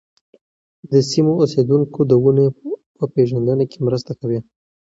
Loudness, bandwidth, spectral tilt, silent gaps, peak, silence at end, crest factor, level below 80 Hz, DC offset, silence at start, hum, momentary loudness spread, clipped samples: -17 LUFS; 7.8 kHz; -8 dB/octave; 2.86-2.95 s; -2 dBFS; 0.45 s; 16 dB; -56 dBFS; under 0.1%; 0.9 s; none; 10 LU; under 0.1%